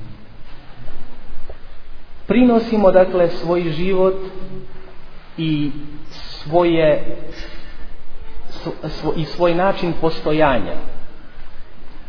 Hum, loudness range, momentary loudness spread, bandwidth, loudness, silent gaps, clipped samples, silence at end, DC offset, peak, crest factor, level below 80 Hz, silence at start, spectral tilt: none; 5 LU; 26 LU; 5.4 kHz; -18 LUFS; none; under 0.1%; 0 s; under 0.1%; 0 dBFS; 18 dB; -32 dBFS; 0 s; -8 dB/octave